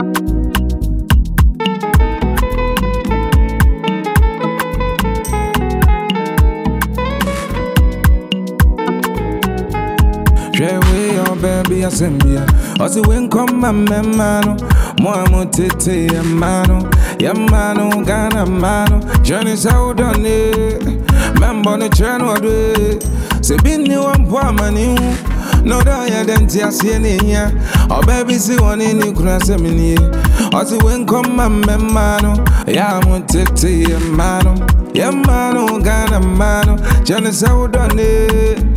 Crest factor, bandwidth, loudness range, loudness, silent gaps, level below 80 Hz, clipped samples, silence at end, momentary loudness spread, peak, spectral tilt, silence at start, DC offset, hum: 12 dB; 16 kHz; 2 LU; -14 LUFS; none; -16 dBFS; under 0.1%; 0 s; 5 LU; 0 dBFS; -5.5 dB/octave; 0 s; under 0.1%; none